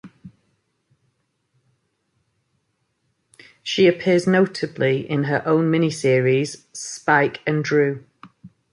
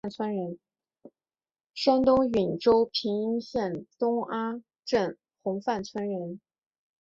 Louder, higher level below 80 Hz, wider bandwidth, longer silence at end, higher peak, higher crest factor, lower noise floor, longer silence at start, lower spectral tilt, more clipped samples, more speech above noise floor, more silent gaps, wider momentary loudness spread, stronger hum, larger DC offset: first, -20 LUFS vs -28 LUFS; about the same, -64 dBFS vs -60 dBFS; first, 11.5 kHz vs 7.6 kHz; second, 0.25 s vs 0.65 s; first, -4 dBFS vs -10 dBFS; about the same, 18 dB vs 20 dB; second, -71 dBFS vs under -90 dBFS; about the same, 0.05 s vs 0.05 s; about the same, -5.5 dB/octave vs -6 dB/octave; neither; second, 52 dB vs over 63 dB; second, none vs 1.66-1.70 s, 4.79-4.83 s; second, 10 LU vs 15 LU; neither; neither